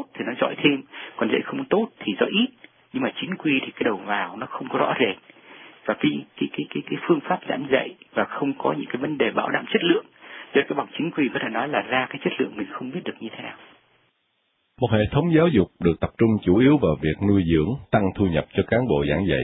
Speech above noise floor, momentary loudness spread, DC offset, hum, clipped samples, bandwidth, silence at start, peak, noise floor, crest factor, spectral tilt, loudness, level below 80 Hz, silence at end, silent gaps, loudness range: 48 dB; 11 LU; under 0.1%; none; under 0.1%; 4 kHz; 0 s; -4 dBFS; -71 dBFS; 20 dB; -11 dB/octave; -23 LUFS; -46 dBFS; 0 s; none; 6 LU